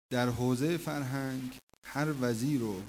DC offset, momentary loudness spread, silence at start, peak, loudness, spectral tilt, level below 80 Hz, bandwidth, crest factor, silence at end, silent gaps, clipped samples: under 0.1%; 10 LU; 0.1 s; -14 dBFS; -33 LUFS; -6 dB/octave; -60 dBFS; 16 kHz; 18 dB; 0 s; 1.63-1.68 s, 1.78-1.82 s; under 0.1%